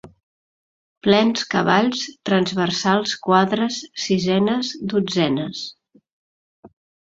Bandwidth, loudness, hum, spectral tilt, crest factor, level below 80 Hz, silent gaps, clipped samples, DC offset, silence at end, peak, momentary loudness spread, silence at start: 7.8 kHz; -20 LUFS; none; -5 dB/octave; 20 dB; -60 dBFS; 0.23-1.01 s, 6.13-6.63 s; under 0.1%; under 0.1%; 0.45 s; -2 dBFS; 8 LU; 0.05 s